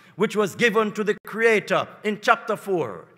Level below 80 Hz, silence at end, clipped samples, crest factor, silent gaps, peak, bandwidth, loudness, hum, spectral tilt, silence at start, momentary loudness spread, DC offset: -76 dBFS; 0.15 s; under 0.1%; 22 dB; 1.20-1.24 s; -2 dBFS; 16 kHz; -22 LUFS; none; -4.5 dB/octave; 0.15 s; 7 LU; under 0.1%